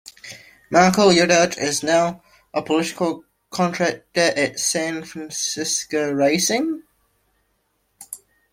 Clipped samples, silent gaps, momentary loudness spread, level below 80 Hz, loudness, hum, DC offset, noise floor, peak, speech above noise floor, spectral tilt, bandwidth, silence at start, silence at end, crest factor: under 0.1%; none; 22 LU; -60 dBFS; -19 LUFS; none; under 0.1%; -68 dBFS; 0 dBFS; 49 dB; -3.5 dB/octave; 16.5 kHz; 0.25 s; 0.35 s; 20 dB